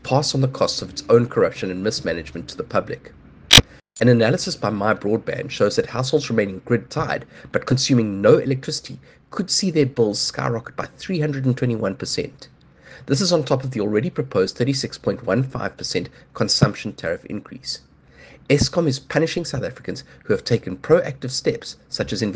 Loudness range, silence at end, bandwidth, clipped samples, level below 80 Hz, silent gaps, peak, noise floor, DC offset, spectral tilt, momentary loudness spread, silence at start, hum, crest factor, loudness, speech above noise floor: 6 LU; 0 s; 10.5 kHz; under 0.1%; -44 dBFS; none; 0 dBFS; -47 dBFS; under 0.1%; -4.5 dB/octave; 13 LU; 0.05 s; none; 22 dB; -20 LUFS; 26 dB